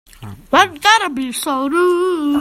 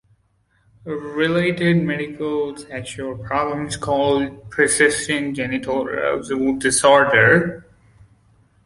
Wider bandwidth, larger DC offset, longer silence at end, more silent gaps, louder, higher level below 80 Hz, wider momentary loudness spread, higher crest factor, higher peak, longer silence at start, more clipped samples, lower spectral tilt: first, 16 kHz vs 11.5 kHz; neither; second, 0 s vs 1.05 s; neither; first, -15 LUFS vs -19 LUFS; about the same, -50 dBFS vs -50 dBFS; second, 8 LU vs 16 LU; about the same, 16 dB vs 18 dB; about the same, 0 dBFS vs -2 dBFS; second, 0.2 s vs 0.85 s; neither; second, -2.5 dB/octave vs -4 dB/octave